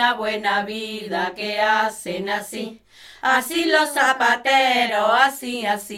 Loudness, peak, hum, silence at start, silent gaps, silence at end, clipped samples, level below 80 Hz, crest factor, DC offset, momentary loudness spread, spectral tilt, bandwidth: -20 LUFS; -2 dBFS; none; 0 s; none; 0 s; under 0.1%; -62 dBFS; 18 dB; under 0.1%; 11 LU; -2 dB/octave; 17 kHz